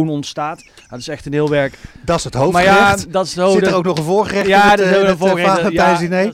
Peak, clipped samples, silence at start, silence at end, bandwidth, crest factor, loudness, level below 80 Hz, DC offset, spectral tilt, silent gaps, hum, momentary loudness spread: -2 dBFS; under 0.1%; 0 s; 0 s; 16 kHz; 12 dB; -14 LUFS; -42 dBFS; under 0.1%; -5 dB/octave; none; none; 14 LU